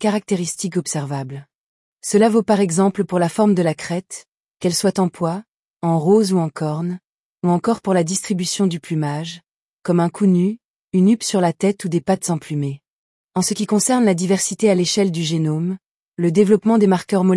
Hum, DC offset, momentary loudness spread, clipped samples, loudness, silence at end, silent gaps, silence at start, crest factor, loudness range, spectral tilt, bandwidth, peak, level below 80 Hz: none; under 0.1%; 12 LU; under 0.1%; -19 LUFS; 0 s; 1.55-1.97 s, 4.34-4.55 s, 5.48-5.80 s, 7.04-7.36 s, 9.51-9.80 s, 10.65-10.88 s, 12.88-13.29 s, 15.86-16.12 s; 0 s; 16 dB; 3 LU; -5.5 dB/octave; 12 kHz; -4 dBFS; -64 dBFS